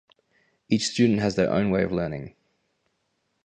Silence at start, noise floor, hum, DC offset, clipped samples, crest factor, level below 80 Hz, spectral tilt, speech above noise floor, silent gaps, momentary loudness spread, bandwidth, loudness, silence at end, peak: 0.7 s; -74 dBFS; none; under 0.1%; under 0.1%; 18 dB; -52 dBFS; -5.5 dB/octave; 51 dB; none; 12 LU; 9.8 kHz; -24 LUFS; 1.15 s; -8 dBFS